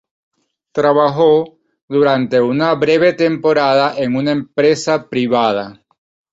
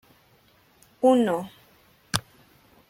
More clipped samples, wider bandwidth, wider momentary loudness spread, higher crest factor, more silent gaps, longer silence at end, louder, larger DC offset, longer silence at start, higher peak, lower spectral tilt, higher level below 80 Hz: neither; second, 8 kHz vs 16.5 kHz; second, 6 LU vs 11 LU; second, 14 dB vs 26 dB; first, 1.82-1.88 s vs none; about the same, 0.6 s vs 0.7 s; first, -14 LUFS vs -24 LUFS; neither; second, 0.75 s vs 1 s; about the same, -2 dBFS vs -2 dBFS; first, -6 dB/octave vs -4.5 dB/octave; about the same, -58 dBFS vs -62 dBFS